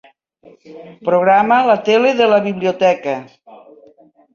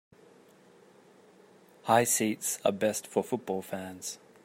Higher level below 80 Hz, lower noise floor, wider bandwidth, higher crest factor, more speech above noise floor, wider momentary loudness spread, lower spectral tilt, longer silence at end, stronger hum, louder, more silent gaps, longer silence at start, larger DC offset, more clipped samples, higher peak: first, -62 dBFS vs -76 dBFS; second, -49 dBFS vs -58 dBFS; second, 7.2 kHz vs 16 kHz; second, 16 dB vs 24 dB; first, 34 dB vs 29 dB; second, 11 LU vs 15 LU; first, -5.5 dB/octave vs -3.5 dB/octave; first, 0.8 s vs 0.3 s; neither; first, -14 LUFS vs -30 LUFS; neither; second, 0.7 s vs 1.85 s; neither; neither; first, 0 dBFS vs -10 dBFS